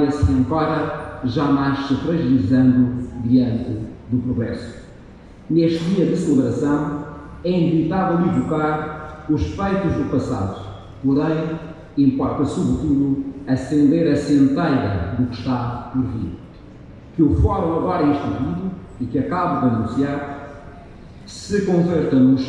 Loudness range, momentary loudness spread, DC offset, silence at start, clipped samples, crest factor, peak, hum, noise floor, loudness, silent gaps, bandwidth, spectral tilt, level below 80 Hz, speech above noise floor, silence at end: 3 LU; 13 LU; under 0.1%; 0 s; under 0.1%; 14 dB; -4 dBFS; none; -41 dBFS; -20 LUFS; none; 9.8 kHz; -8 dB/octave; -36 dBFS; 23 dB; 0 s